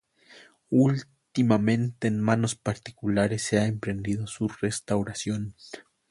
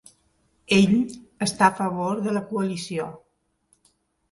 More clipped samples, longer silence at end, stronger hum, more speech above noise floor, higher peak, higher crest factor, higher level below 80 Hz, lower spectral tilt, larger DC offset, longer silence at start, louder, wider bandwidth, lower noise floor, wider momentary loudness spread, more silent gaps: neither; second, 0.3 s vs 1.15 s; neither; second, 28 dB vs 45 dB; second, -8 dBFS vs -2 dBFS; about the same, 18 dB vs 22 dB; about the same, -56 dBFS vs -60 dBFS; about the same, -6 dB/octave vs -5 dB/octave; neither; second, 0.35 s vs 0.7 s; second, -27 LUFS vs -23 LUFS; about the same, 11.5 kHz vs 11.5 kHz; second, -54 dBFS vs -67 dBFS; about the same, 10 LU vs 12 LU; neither